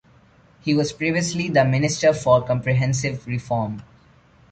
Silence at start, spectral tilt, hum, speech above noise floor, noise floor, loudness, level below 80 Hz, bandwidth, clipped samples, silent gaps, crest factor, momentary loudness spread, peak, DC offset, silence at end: 0.65 s; -5.5 dB/octave; none; 33 dB; -53 dBFS; -21 LUFS; -52 dBFS; 9.2 kHz; under 0.1%; none; 18 dB; 9 LU; -4 dBFS; under 0.1%; 0.7 s